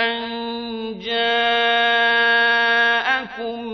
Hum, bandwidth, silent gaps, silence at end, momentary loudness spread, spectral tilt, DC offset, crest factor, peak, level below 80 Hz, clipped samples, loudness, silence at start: none; 6.4 kHz; none; 0 s; 13 LU; -3 dB/octave; under 0.1%; 14 dB; -6 dBFS; -58 dBFS; under 0.1%; -17 LUFS; 0 s